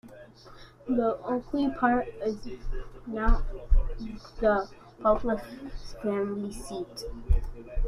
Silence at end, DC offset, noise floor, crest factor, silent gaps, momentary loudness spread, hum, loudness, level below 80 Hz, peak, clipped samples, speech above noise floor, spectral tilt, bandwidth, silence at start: 0 s; under 0.1%; -50 dBFS; 18 dB; none; 16 LU; none; -30 LUFS; -32 dBFS; -10 dBFS; under 0.1%; 23 dB; -7 dB/octave; 11 kHz; 0.05 s